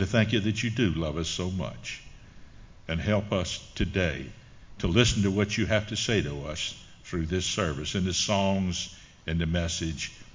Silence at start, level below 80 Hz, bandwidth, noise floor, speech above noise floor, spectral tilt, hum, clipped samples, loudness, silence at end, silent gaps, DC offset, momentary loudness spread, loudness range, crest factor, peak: 0 s; -42 dBFS; 7.6 kHz; -47 dBFS; 20 dB; -4.5 dB/octave; none; under 0.1%; -28 LUFS; 0.1 s; none; under 0.1%; 12 LU; 4 LU; 22 dB; -6 dBFS